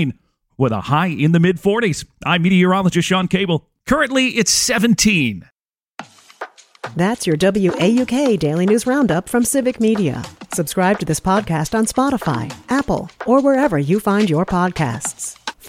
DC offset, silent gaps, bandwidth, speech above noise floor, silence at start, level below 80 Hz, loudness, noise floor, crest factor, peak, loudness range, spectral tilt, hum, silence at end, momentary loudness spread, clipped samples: under 0.1%; none; 16.5 kHz; 23 dB; 0 s; -44 dBFS; -17 LUFS; -39 dBFS; 16 dB; -2 dBFS; 3 LU; -5 dB/octave; none; 0 s; 11 LU; under 0.1%